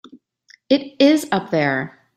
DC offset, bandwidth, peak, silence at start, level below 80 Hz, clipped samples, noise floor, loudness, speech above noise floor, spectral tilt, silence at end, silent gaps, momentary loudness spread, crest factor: under 0.1%; 15 kHz; -2 dBFS; 0.15 s; -64 dBFS; under 0.1%; -54 dBFS; -18 LUFS; 36 dB; -5.5 dB/octave; 0.3 s; none; 6 LU; 18 dB